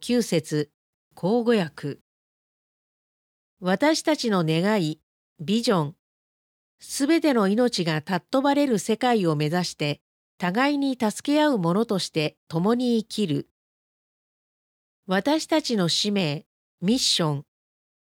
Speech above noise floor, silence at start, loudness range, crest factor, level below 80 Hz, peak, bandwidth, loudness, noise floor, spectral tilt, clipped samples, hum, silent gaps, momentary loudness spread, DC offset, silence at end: over 67 dB; 0 s; 4 LU; 16 dB; -68 dBFS; -8 dBFS; 17 kHz; -24 LUFS; under -90 dBFS; -5 dB/octave; under 0.1%; none; 0.74-1.11 s, 2.01-3.57 s, 5.03-5.36 s, 5.99-6.78 s, 10.01-10.38 s, 12.37-12.47 s, 13.51-15.03 s, 16.46-16.78 s; 9 LU; under 0.1%; 0.75 s